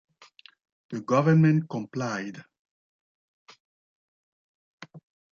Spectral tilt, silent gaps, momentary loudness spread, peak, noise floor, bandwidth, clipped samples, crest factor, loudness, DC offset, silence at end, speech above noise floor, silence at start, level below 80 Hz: -8 dB/octave; 2.59-2.65 s, 2.71-3.46 s, 3.60-4.78 s; 19 LU; -10 dBFS; -55 dBFS; 7 kHz; under 0.1%; 20 dB; -25 LUFS; under 0.1%; 0.4 s; 31 dB; 0.9 s; -72 dBFS